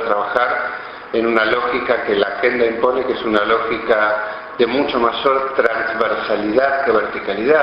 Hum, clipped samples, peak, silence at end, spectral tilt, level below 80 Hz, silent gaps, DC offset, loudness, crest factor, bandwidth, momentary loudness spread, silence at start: none; under 0.1%; -2 dBFS; 0 s; -6.5 dB/octave; -50 dBFS; none; under 0.1%; -17 LUFS; 16 dB; 6 kHz; 5 LU; 0 s